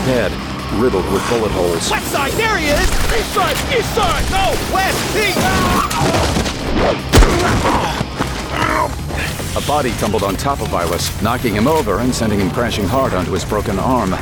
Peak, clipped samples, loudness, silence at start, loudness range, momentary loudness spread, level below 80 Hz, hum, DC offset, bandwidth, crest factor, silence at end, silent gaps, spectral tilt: 0 dBFS; under 0.1%; -16 LUFS; 0 s; 3 LU; 5 LU; -24 dBFS; none; under 0.1%; over 20 kHz; 16 dB; 0 s; none; -4.5 dB/octave